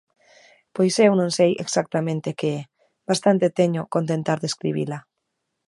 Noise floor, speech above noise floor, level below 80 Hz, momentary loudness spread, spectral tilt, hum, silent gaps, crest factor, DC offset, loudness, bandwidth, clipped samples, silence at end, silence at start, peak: -78 dBFS; 57 dB; -68 dBFS; 12 LU; -5.5 dB/octave; none; none; 20 dB; under 0.1%; -22 LUFS; 11.5 kHz; under 0.1%; 0.7 s; 0.75 s; -2 dBFS